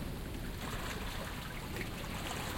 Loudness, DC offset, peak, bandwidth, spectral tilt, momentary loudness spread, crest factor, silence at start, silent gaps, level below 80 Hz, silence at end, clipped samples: -41 LUFS; under 0.1%; -26 dBFS; 16.5 kHz; -4 dB/octave; 3 LU; 14 dB; 0 s; none; -46 dBFS; 0 s; under 0.1%